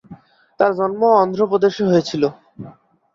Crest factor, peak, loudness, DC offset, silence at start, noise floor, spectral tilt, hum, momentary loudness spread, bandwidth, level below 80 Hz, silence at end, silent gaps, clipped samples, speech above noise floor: 16 dB; -2 dBFS; -17 LUFS; under 0.1%; 0.1 s; -43 dBFS; -6.5 dB/octave; none; 20 LU; 7.4 kHz; -60 dBFS; 0.45 s; none; under 0.1%; 27 dB